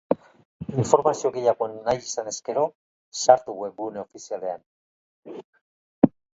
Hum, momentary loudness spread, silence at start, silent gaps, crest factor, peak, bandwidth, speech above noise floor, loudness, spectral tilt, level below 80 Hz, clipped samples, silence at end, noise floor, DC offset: none; 19 LU; 0.1 s; 0.45-0.60 s, 2.75-3.12 s, 4.66-5.23 s, 5.44-5.53 s, 5.61-6.02 s; 26 dB; 0 dBFS; 8 kHz; over 66 dB; -24 LUFS; -5.5 dB/octave; -60 dBFS; under 0.1%; 0.3 s; under -90 dBFS; under 0.1%